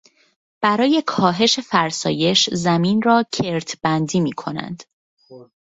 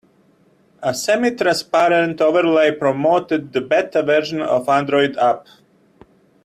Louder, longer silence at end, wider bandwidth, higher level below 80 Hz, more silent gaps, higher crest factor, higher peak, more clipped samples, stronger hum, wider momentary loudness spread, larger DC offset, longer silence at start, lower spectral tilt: about the same, -18 LUFS vs -17 LUFS; second, 0.35 s vs 1.05 s; second, 8 kHz vs 14 kHz; about the same, -58 dBFS vs -62 dBFS; first, 4.93-5.17 s vs none; about the same, 20 dB vs 16 dB; about the same, 0 dBFS vs -2 dBFS; neither; neither; first, 10 LU vs 6 LU; neither; second, 0.6 s vs 0.8 s; about the same, -4.5 dB/octave vs -4.5 dB/octave